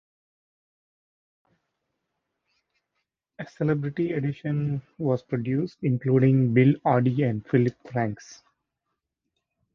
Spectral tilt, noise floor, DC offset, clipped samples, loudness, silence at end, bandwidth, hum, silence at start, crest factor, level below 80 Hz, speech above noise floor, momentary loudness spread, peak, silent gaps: -9 dB/octave; -82 dBFS; under 0.1%; under 0.1%; -25 LUFS; 1.4 s; 6.8 kHz; none; 3.4 s; 20 dB; -64 dBFS; 58 dB; 9 LU; -8 dBFS; none